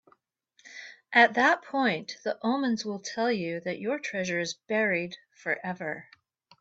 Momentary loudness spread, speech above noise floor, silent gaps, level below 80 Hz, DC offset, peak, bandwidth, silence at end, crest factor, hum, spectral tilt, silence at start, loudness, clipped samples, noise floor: 17 LU; 40 dB; none; -74 dBFS; under 0.1%; -6 dBFS; 8 kHz; 0.6 s; 22 dB; none; -4 dB/octave; 0.65 s; -28 LUFS; under 0.1%; -68 dBFS